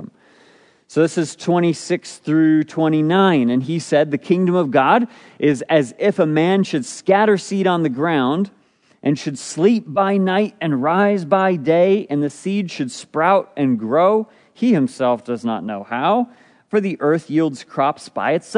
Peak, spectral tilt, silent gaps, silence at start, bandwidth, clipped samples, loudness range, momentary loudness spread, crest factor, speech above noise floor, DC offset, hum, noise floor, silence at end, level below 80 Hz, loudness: -2 dBFS; -6.5 dB/octave; none; 0 s; 10.5 kHz; under 0.1%; 3 LU; 8 LU; 16 dB; 35 dB; under 0.1%; none; -52 dBFS; 0 s; -72 dBFS; -18 LUFS